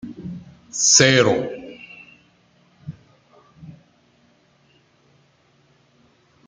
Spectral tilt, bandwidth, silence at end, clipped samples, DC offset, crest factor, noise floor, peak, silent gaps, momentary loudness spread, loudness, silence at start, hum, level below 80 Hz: -2.5 dB/octave; 10.5 kHz; 2.75 s; under 0.1%; under 0.1%; 24 dB; -59 dBFS; 0 dBFS; none; 28 LU; -15 LUFS; 0.05 s; none; -60 dBFS